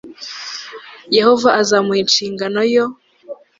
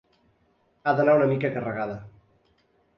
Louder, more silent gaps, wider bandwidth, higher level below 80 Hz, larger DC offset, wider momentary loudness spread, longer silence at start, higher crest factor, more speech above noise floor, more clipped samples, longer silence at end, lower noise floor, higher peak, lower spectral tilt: first, -14 LUFS vs -24 LUFS; neither; first, 7.8 kHz vs 6 kHz; about the same, -62 dBFS vs -64 dBFS; neither; first, 21 LU vs 13 LU; second, 0.05 s vs 0.85 s; about the same, 16 dB vs 18 dB; second, 22 dB vs 43 dB; neither; second, 0.25 s vs 0.9 s; second, -36 dBFS vs -67 dBFS; first, 0 dBFS vs -10 dBFS; second, -3 dB/octave vs -9.5 dB/octave